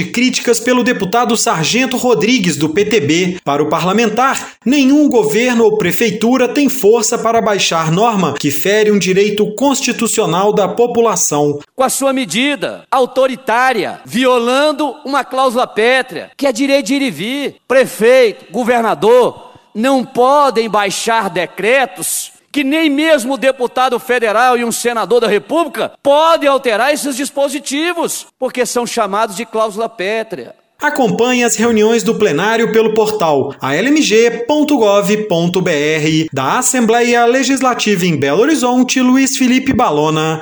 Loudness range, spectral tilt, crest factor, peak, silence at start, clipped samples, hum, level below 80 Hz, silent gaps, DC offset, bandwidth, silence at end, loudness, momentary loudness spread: 3 LU; -4 dB/octave; 12 dB; 0 dBFS; 0 s; under 0.1%; none; -54 dBFS; none; under 0.1%; over 20 kHz; 0 s; -13 LUFS; 7 LU